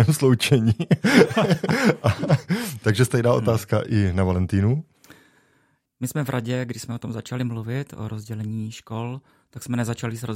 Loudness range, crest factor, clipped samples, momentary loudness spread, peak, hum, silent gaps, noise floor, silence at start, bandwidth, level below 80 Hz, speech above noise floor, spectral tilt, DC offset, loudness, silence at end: 10 LU; 20 dB; under 0.1%; 14 LU; -2 dBFS; none; none; -65 dBFS; 0 s; 16 kHz; -56 dBFS; 43 dB; -6 dB/octave; under 0.1%; -22 LUFS; 0 s